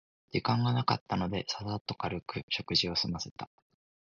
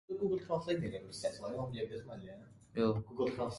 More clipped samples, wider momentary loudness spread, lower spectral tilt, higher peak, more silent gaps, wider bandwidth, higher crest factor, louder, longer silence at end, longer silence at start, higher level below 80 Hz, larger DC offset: neither; second, 10 LU vs 14 LU; second, -5 dB/octave vs -6.5 dB/octave; first, -12 dBFS vs -20 dBFS; first, 1.01-1.06 s, 1.81-1.85 s, 2.43-2.48 s, 3.31-3.36 s vs none; second, 7.4 kHz vs 11.5 kHz; about the same, 22 dB vs 18 dB; first, -32 LUFS vs -38 LUFS; first, 0.65 s vs 0 s; first, 0.35 s vs 0.1 s; first, -56 dBFS vs -64 dBFS; neither